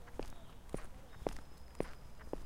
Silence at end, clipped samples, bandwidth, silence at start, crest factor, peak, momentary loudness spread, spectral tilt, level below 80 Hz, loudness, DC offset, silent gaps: 0 s; under 0.1%; 16.5 kHz; 0 s; 26 dB; -20 dBFS; 11 LU; -6 dB/octave; -52 dBFS; -49 LUFS; under 0.1%; none